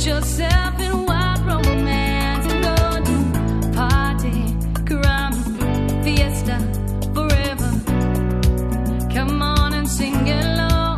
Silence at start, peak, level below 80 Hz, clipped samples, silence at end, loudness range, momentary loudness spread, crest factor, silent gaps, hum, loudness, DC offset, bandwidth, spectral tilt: 0 s; -2 dBFS; -22 dBFS; under 0.1%; 0 s; 1 LU; 4 LU; 16 dB; none; none; -19 LUFS; under 0.1%; 14 kHz; -5.5 dB/octave